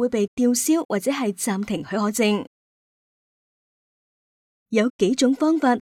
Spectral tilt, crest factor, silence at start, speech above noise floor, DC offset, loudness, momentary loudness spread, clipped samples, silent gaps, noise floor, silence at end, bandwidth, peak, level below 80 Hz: -4 dB/octave; 16 dB; 0 s; over 69 dB; under 0.1%; -22 LUFS; 7 LU; under 0.1%; 0.28-0.37 s, 0.85-0.89 s, 2.47-4.66 s, 4.90-4.99 s; under -90 dBFS; 0.15 s; 17.5 kHz; -6 dBFS; -62 dBFS